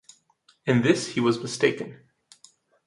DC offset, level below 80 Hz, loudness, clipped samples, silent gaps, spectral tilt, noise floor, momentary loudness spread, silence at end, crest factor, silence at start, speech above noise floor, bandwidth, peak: under 0.1%; -66 dBFS; -24 LUFS; under 0.1%; none; -5.5 dB/octave; -63 dBFS; 14 LU; 0.9 s; 20 dB; 0.65 s; 40 dB; 11.5 kHz; -6 dBFS